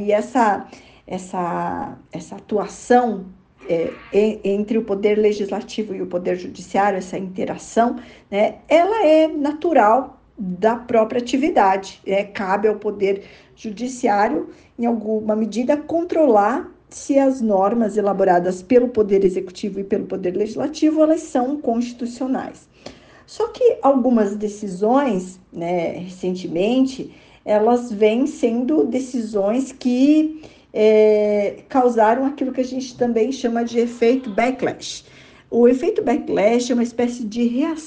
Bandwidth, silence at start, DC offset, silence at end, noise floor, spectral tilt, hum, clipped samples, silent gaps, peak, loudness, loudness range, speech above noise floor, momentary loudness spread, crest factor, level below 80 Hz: 9.6 kHz; 0 s; under 0.1%; 0 s; -42 dBFS; -6 dB/octave; none; under 0.1%; none; -2 dBFS; -19 LUFS; 4 LU; 23 dB; 12 LU; 16 dB; -56 dBFS